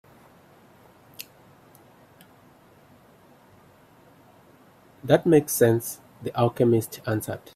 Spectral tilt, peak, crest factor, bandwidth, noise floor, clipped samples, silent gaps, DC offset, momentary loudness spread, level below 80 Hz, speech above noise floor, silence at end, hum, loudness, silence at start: -6 dB/octave; -4 dBFS; 24 dB; 16 kHz; -55 dBFS; under 0.1%; none; under 0.1%; 24 LU; -62 dBFS; 32 dB; 0.15 s; none; -23 LUFS; 1.2 s